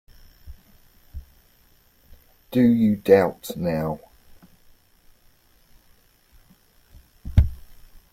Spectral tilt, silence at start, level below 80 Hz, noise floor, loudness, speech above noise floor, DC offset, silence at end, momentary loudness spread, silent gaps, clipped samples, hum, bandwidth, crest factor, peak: -8 dB/octave; 0.45 s; -36 dBFS; -58 dBFS; -21 LUFS; 38 dB; under 0.1%; 0.4 s; 27 LU; none; under 0.1%; none; 16 kHz; 22 dB; -2 dBFS